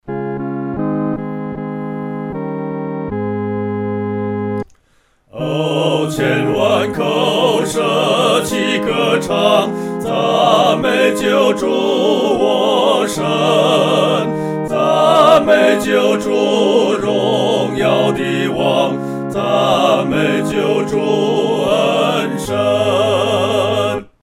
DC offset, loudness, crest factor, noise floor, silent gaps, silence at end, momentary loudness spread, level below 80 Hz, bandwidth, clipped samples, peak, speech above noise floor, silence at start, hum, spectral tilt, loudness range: under 0.1%; -15 LUFS; 14 dB; -56 dBFS; none; 0.2 s; 10 LU; -48 dBFS; 16.5 kHz; under 0.1%; 0 dBFS; 42 dB; 0.05 s; none; -5 dB/octave; 9 LU